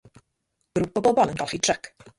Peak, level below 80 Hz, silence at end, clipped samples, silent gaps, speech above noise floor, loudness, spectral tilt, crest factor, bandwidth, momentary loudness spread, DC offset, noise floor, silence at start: -6 dBFS; -56 dBFS; 0.1 s; under 0.1%; none; 53 dB; -24 LUFS; -3.5 dB/octave; 18 dB; 11.5 kHz; 9 LU; under 0.1%; -76 dBFS; 0.75 s